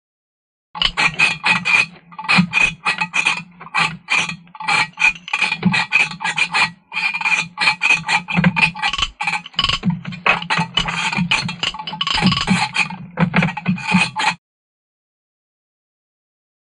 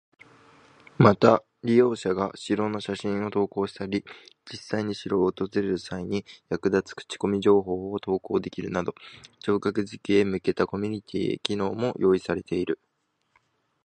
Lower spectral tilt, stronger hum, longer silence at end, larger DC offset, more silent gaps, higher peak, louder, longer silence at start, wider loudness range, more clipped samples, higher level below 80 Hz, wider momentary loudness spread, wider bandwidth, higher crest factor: second, -3.5 dB/octave vs -6.5 dB/octave; neither; first, 2.25 s vs 1.1 s; neither; neither; about the same, 0 dBFS vs -2 dBFS; first, -17 LUFS vs -26 LUFS; second, 0.75 s vs 1 s; about the same, 3 LU vs 5 LU; neither; first, -44 dBFS vs -58 dBFS; second, 8 LU vs 11 LU; first, 11 kHz vs 9.4 kHz; second, 18 dB vs 24 dB